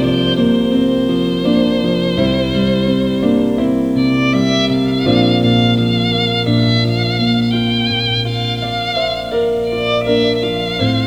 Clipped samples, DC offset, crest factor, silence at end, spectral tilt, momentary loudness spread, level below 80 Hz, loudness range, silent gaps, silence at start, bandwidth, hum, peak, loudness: under 0.1%; 0.4%; 14 dB; 0 s; -6.5 dB/octave; 4 LU; -38 dBFS; 2 LU; none; 0 s; 12.5 kHz; none; -2 dBFS; -15 LUFS